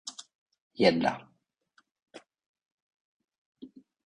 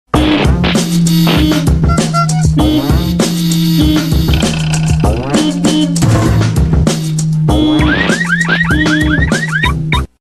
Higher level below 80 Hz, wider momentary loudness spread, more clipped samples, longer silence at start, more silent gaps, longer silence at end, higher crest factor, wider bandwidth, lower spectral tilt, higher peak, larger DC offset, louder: second, -70 dBFS vs -20 dBFS; first, 27 LU vs 3 LU; neither; about the same, 0.05 s vs 0.15 s; first, 0.35-0.46 s, 0.62-0.70 s, 1.91-1.95 s, 2.02-2.06 s, 2.46-2.54 s, 2.72-3.20 s, 3.38-3.53 s vs none; first, 0.4 s vs 0.15 s; first, 26 dB vs 10 dB; second, 11 kHz vs 14.5 kHz; about the same, -5 dB/octave vs -5.5 dB/octave; second, -8 dBFS vs 0 dBFS; neither; second, -27 LUFS vs -11 LUFS